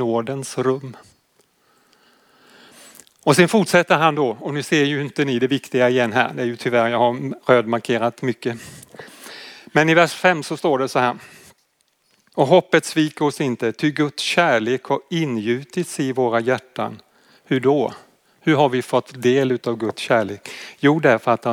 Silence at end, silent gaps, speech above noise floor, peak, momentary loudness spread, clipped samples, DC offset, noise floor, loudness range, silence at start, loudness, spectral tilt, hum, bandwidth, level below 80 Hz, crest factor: 0 s; none; 46 dB; -2 dBFS; 13 LU; under 0.1%; under 0.1%; -65 dBFS; 3 LU; 0 s; -19 LUFS; -5 dB/octave; none; 17.5 kHz; -72 dBFS; 18 dB